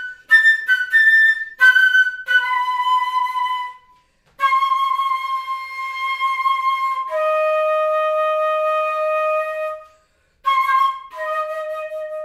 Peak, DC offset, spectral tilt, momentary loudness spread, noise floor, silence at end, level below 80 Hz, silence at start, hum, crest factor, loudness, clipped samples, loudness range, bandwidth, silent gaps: -2 dBFS; under 0.1%; 1.5 dB/octave; 15 LU; -59 dBFS; 0 s; -66 dBFS; 0 s; none; 16 dB; -17 LUFS; under 0.1%; 7 LU; 16 kHz; none